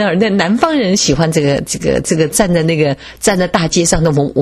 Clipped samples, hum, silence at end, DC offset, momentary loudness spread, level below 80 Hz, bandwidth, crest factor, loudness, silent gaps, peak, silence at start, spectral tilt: under 0.1%; none; 0 s; under 0.1%; 3 LU; -32 dBFS; 13.5 kHz; 12 dB; -13 LUFS; none; 0 dBFS; 0 s; -4.5 dB/octave